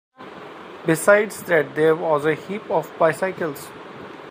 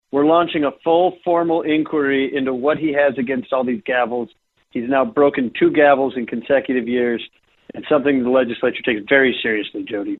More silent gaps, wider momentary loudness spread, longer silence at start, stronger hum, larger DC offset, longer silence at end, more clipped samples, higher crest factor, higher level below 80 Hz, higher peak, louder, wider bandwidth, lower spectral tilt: neither; first, 21 LU vs 11 LU; about the same, 0.2 s vs 0.15 s; neither; neither; about the same, 0 s vs 0.05 s; neither; first, 22 dB vs 16 dB; second, -68 dBFS vs -58 dBFS; about the same, 0 dBFS vs -2 dBFS; about the same, -20 LUFS vs -18 LUFS; first, 15.5 kHz vs 4.2 kHz; second, -5 dB/octave vs -9 dB/octave